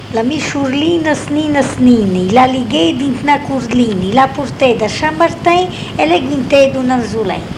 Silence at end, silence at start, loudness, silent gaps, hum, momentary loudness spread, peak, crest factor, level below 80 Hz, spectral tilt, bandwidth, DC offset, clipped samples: 0 s; 0 s; -13 LUFS; none; none; 5 LU; 0 dBFS; 12 dB; -40 dBFS; -5.5 dB/octave; 11.5 kHz; under 0.1%; 0.1%